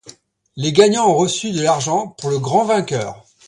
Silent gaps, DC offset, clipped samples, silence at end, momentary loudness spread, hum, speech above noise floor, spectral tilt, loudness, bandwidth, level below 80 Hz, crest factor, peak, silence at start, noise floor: none; under 0.1%; under 0.1%; 0.3 s; 10 LU; none; 29 dB; -4.5 dB/octave; -17 LUFS; 11.5 kHz; -58 dBFS; 18 dB; 0 dBFS; 0.05 s; -45 dBFS